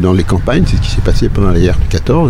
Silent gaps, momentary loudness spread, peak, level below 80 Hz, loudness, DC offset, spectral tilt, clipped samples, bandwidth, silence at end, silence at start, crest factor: none; 3 LU; 0 dBFS; -14 dBFS; -12 LUFS; under 0.1%; -7 dB/octave; under 0.1%; 11.5 kHz; 0 s; 0 s; 10 dB